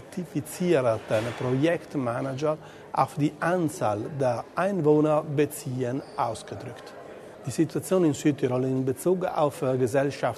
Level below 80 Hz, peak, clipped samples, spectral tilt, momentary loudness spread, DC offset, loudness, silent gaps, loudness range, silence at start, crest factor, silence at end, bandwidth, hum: -64 dBFS; -8 dBFS; under 0.1%; -6.5 dB/octave; 11 LU; under 0.1%; -26 LUFS; none; 2 LU; 0 s; 18 dB; 0 s; 13.5 kHz; none